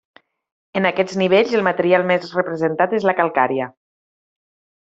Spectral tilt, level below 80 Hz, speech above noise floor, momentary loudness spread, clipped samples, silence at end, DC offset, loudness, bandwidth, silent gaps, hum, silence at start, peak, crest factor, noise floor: -6 dB/octave; -64 dBFS; over 72 dB; 7 LU; under 0.1%; 1.1 s; under 0.1%; -18 LUFS; 7.8 kHz; none; none; 0.75 s; -2 dBFS; 18 dB; under -90 dBFS